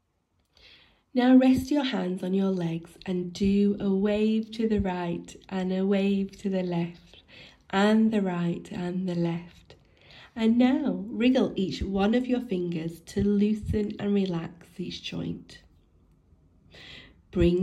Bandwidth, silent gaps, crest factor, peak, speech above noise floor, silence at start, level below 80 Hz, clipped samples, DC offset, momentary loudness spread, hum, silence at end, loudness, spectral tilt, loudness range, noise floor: 12.5 kHz; none; 18 dB; -8 dBFS; 47 dB; 1.15 s; -48 dBFS; under 0.1%; under 0.1%; 13 LU; none; 0 s; -27 LUFS; -7.5 dB/octave; 4 LU; -73 dBFS